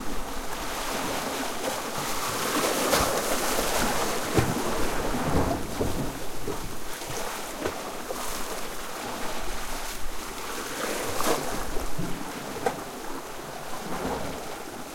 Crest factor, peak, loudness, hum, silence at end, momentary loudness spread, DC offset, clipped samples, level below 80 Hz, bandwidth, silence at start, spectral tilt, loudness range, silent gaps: 22 dB; -6 dBFS; -30 LUFS; none; 0 s; 10 LU; under 0.1%; under 0.1%; -40 dBFS; 16.5 kHz; 0 s; -3.5 dB/octave; 8 LU; none